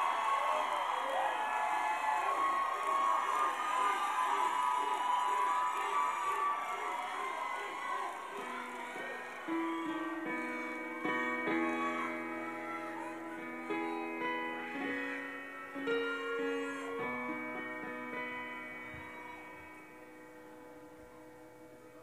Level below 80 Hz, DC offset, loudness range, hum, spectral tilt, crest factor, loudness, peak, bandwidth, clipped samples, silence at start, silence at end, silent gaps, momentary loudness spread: -78 dBFS; under 0.1%; 10 LU; none; -3 dB/octave; 16 dB; -36 LUFS; -20 dBFS; 15.5 kHz; under 0.1%; 0 s; 0 s; none; 18 LU